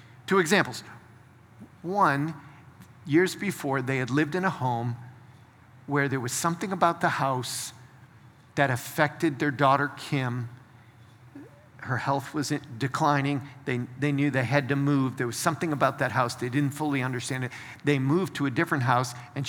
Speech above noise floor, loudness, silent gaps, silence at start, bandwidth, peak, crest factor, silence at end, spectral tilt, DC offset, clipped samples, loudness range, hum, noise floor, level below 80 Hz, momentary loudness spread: 27 dB; -27 LUFS; none; 0.05 s; 19.5 kHz; -6 dBFS; 22 dB; 0 s; -5.5 dB/octave; under 0.1%; under 0.1%; 3 LU; none; -53 dBFS; -70 dBFS; 9 LU